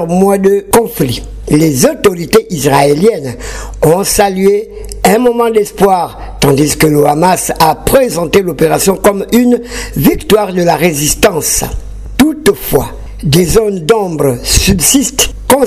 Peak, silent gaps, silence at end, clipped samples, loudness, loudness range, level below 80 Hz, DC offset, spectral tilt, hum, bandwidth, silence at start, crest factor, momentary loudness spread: 0 dBFS; none; 0 s; 0.5%; -10 LUFS; 2 LU; -26 dBFS; under 0.1%; -4.5 dB/octave; none; 16.5 kHz; 0 s; 10 dB; 7 LU